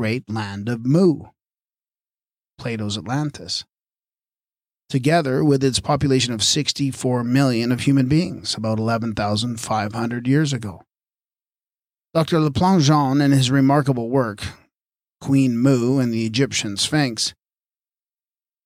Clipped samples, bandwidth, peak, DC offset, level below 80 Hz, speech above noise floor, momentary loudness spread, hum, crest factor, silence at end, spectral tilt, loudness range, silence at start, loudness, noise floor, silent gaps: under 0.1%; 15 kHz; -6 dBFS; under 0.1%; -52 dBFS; over 71 dB; 10 LU; none; 14 dB; 1.35 s; -5.5 dB/octave; 6 LU; 0 s; -20 LUFS; under -90 dBFS; none